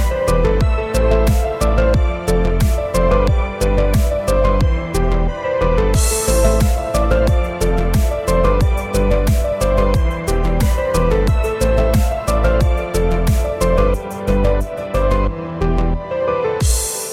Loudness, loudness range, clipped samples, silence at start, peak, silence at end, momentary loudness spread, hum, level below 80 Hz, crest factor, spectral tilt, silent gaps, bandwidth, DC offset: -17 LUFS; 2 LU; under 0.1%; 0 s; -2 dBFS; 0 s; 4 LU; none; -18 dBFS; 14 dB; -6 dB/octave; none; 16 kHz; under 0.1%